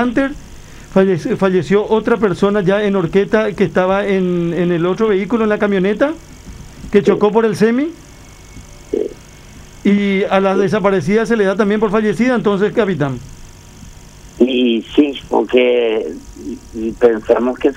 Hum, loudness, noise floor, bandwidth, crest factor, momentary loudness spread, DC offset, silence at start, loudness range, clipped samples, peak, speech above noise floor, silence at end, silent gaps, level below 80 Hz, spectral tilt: none; -15 LUFS; -38 dBFS; 11.5 kHz; 14 dB; 10 LU; under 0.1%; 0 s; 3 LU; under 0.1%; 0 dBFS; 24 dB; 0 s; none; -40 dBFS; -7 dB/octave